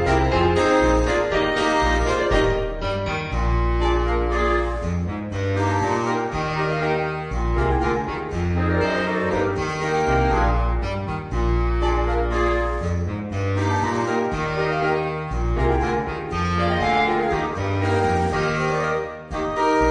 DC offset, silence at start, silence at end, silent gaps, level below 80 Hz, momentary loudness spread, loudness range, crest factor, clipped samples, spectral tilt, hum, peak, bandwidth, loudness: under 0.1%; 0 s; 0 s; none; -28 dBFS; 7 LU; 2 LU; 14 dB; under 0.1%; -6.5 dB/octave; none; -6 dBFS; 10 kHz; -22 LUFS